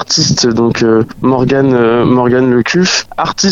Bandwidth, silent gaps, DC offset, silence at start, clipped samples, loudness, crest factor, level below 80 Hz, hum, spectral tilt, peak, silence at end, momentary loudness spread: 7.8 kHz; none; under 0.1%; 0 s; under 0.1%; -10 LUFS; 10 dB; -40 dBFS; none; -4.5 dB/octave; 0 dBFS; 0 s; 3 LU